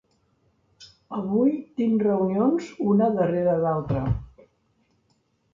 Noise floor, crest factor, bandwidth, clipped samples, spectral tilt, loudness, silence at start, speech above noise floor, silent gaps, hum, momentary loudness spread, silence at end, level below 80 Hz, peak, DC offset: -68 dBFS; 14 dB; 7.4 kHz; under 0.1%; -9.5 dB/octave; -24 LUFS; 0.8 s; 46 dB; none; none; 7 LU; 1.3 s; -46 dBFS; -10 dBFS; under 0.1%